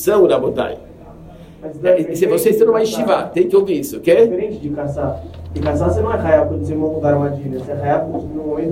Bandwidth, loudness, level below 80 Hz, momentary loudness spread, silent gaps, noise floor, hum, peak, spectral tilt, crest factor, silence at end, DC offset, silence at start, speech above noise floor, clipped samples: 16 kHz; -17 LUFS; -42 dBFS; 11 LU; none; -38 dBFS; none; 0 dBFS; -6.5 dB/octave; 16 dB; 0 s; under 0.1%; 0 s; 22 dB; under 0.1%